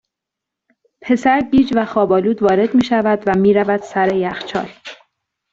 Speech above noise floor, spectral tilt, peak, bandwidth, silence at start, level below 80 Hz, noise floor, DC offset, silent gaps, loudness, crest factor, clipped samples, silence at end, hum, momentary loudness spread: 68 dB; -7 dB/octave; -2 dBFS; 7.8 kHz; 1.05 s; -50 dBFS; -83 dBFS; under 0.1%; none; -16 LUFS; 14 dB; under 0.1%; 0.6 s; none; 11 LU